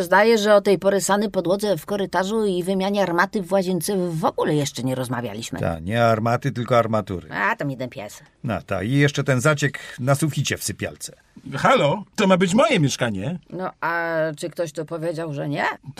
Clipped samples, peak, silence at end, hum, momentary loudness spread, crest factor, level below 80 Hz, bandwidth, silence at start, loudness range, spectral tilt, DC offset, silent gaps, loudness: under 0.1%; -4 dBFS; 0.1 s; none; 12 LU; 18 dB; -54 dBFS; 15.5 kHz; 0 s; 2 LU; -5 dB/octave; under 0.1%; none; -21 LUFS